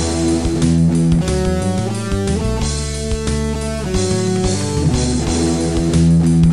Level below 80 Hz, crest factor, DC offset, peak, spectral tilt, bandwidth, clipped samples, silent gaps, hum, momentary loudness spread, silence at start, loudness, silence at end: -26 dBFS; 12 dB; 2%; -4 dBFS; -6 dB/octave; 12 kHz; under 0.1%; none; none; 7 LU; 0 s; -17 LUFS; 0 s